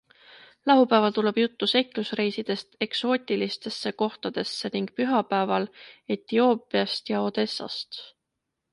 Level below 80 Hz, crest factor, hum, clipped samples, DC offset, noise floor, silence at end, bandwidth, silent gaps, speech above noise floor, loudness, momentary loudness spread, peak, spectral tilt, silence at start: -74 dBFS; 20 dB; none; under 0.1%; under 0.1%; -82 dBFS; 0.65 s; 11.5 kHz; none; 57 dB; -26 LUFS; 11 LU; -6 dBFS; -5.5 dB/octave; 0.35 s